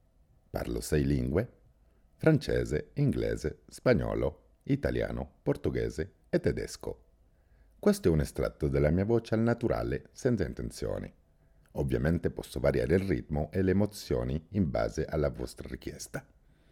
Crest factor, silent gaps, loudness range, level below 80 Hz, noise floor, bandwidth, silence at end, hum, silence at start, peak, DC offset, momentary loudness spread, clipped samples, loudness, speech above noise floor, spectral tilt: 20 dB; none; 3 LU; -44 dBFS; -64 dBFS; 17 kHz; 0.5 s; none; 0.55 s; -10 dBFS; under 0.1%; 13 LU; under 0.1%; -31 LUFS; 34 dB; -7 dB/octave